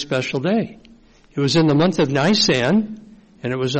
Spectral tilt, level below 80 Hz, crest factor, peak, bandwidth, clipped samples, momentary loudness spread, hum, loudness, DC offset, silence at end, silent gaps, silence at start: -5 dB/octave; -50 dBFS; 14 dB; -6 dBFS; 8.8 kHz; under 0.1%; 16 LU; none; -18 LUFS; under 0.1%; 0 s; none; 0 s